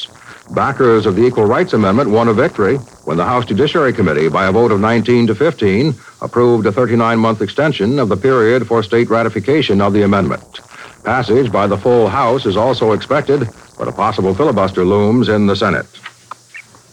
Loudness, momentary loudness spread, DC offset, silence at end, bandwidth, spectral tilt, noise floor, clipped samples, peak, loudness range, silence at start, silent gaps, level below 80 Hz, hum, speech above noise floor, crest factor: -13 LUFS; 8 LU; under 0.1%; 0.3 s; 11 kHz; -7 dB/octave; -38 dBFS; under 0.1%; -2 dBFS; 1 LU; 0 s; none; -48 dBFS; none; 25 dB; 12 dB